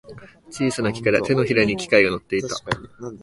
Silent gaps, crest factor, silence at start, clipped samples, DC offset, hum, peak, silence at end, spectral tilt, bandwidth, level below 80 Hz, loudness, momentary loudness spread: none; 20 dB; 0.1 s; under 0.1%; under 0.1%; none; 0 dBFS; 0 s; -5 dB/octave; 11.5 kHz; -50 dBFS; -21 LUFS; 11 LU